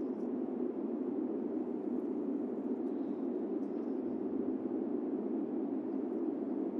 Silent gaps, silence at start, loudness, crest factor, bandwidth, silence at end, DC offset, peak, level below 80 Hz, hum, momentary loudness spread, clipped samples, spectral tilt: none; 0 s; -37 LUFS; 12 dB; 3.7 kHz; 0 s; under 0.1%; -24 dBFS; -84 dBFS; none; 1 LU; under 0.1%; -10.5 dB/octave